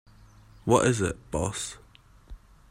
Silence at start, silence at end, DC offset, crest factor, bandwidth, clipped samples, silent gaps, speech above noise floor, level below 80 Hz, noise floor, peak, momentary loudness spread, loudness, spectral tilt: 0.65 s; 0.35 s; under 0.1%; 24 dB; 16 kHz; under 0.1%; none; 27 dB; -48 dBFS; -53 dBFS; -6 dBFS; 14 LU; -27 LUFS; -5 dB/octave